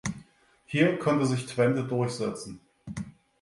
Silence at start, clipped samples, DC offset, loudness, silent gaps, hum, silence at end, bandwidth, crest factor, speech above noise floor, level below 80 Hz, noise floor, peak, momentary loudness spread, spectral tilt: 0.05 s; under 0.1%; under 0.1%; -27 LUFS; none; none; 0.3 s; 11.5 kHz; 20 dB; 32 dB; -60 dBFS; -58 dBFS; -10 dBFS; 19 LU; -6 dB/octave